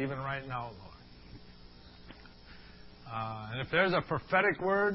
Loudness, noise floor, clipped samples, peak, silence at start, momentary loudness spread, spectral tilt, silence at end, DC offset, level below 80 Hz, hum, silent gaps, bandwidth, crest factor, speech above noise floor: -32 LUFS; -53 dBFS; under 0.1%; -12 dBFS; 0 s; 25 LU; -9 dB/octave; 0 s; under 0.1%; -58 dBFS; none; none; 5.8 kHz; 22 dB; 21 dB